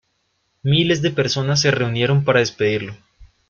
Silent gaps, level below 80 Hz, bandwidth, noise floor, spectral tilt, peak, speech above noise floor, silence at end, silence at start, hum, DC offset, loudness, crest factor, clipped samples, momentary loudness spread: none; -52 dBFS; 7.4 kHz; -68 dBFS; -5 dB/octave; -4 dBFS; 50 dB; 0.25 s; 0.65 s; none; under 0.1%; -18 LUFS; 16 dB; under 0.1%; 7 LU